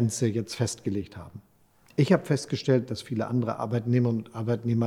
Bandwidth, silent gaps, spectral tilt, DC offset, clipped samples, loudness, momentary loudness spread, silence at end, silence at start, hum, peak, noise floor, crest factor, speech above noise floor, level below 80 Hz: 13.5 kHz; none; -6.5 dB/octave; under 0.1%; under 0.1%; -27 LUFS; 10 LU; 0 s; 0 s; none; -8 dBFS; -60 dBFS; 18 dB; 34 dB; -64 dBFS